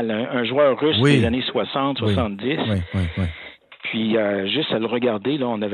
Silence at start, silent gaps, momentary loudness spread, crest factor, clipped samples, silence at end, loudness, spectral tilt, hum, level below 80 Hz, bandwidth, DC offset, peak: 0 s; none; 9 LU; 18 dB; under 0.1%; 0 s; -21 LUFS; -7 dB/octave; none; -44 dBFS; 10.5 kHz; under 0.1%; -4 dBFS